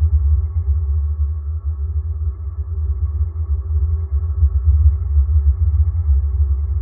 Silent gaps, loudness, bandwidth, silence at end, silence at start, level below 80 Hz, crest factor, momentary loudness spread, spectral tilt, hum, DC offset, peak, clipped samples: none; -19 LUFS; 1.4 kHz; 0 s; 0 s; -18 dBFS; 14 dB; 8 LU; -14.5 dB/octave; none; under 0.1%; -4 dBFS; under 0.1%